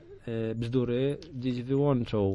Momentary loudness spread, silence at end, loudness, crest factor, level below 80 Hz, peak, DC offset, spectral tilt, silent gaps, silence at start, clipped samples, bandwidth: 8 LU; 0 s; -30 LUFS; 14 dB; -54 dBFS; -14 dBFS; under 0.1%; -9 dB/octave; none; 0 s; under 0.1%; 10.5 kHz